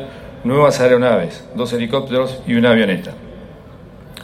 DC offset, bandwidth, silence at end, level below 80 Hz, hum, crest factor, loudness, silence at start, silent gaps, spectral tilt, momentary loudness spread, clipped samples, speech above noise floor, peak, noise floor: under 0.1%; 15 kHz; 0 s; -46 dBFS; none; 16 dB; -16 LUFS; 0 s; none; -6 dB/octave; 20 LU; under 0.1%; 23 dB; 0 dBFS; -38 dBFS